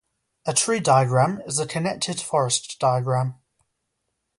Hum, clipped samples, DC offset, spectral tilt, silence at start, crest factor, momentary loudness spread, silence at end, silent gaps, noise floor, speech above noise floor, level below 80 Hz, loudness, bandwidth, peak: none; under 0.1%; under 0.1%; -4 dB/octave; 0.45 s; 18 dB; 8 LU; 1.05 s; none; -77 dBFS; 55 dB; -62 dBFS; -22 LUFS; 11.5 kHz; -6 dBFS